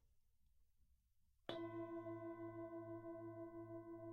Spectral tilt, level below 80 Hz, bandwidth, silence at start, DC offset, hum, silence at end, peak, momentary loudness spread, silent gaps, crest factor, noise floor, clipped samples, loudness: -8 dB/octave; -80 dBFS; 6.4 kHz; 0.05 s; under 0.1%; none; 0 s; -32 dBFS; 5 LU; none; 22 dB; -78 dBFS; under 0.1%; -53 LUFS